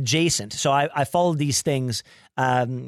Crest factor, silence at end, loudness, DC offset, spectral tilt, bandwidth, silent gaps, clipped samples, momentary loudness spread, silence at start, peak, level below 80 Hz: 14 dB; 0 s; -22 LUFS; under 0.1%; -4 dB/octave; 15.5 kHz; none; under 0.1%; 7 LU; 0 s; -8 dBFS; -56 dBFS